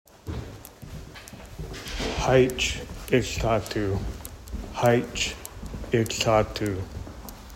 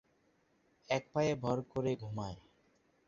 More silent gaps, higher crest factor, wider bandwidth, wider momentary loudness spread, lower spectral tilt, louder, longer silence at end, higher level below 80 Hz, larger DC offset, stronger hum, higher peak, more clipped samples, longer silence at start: neither; about the same, 20 dB vs 20 dB; first, 16.5 kHz vs 7.4 kHz; first, 20 LU vs 10 LU; about the same, -4.5 dB/octave vs -5.5 dB/octave; first, -26 LUFS vs -37 LUFS; second, 0 s vs 0.65 s; first, -40 dBFS vs -64 dBFS; neither; neither; first, -6 dBFS vs -18 dBFS; neither; second, 0.25 s vs 0.9 s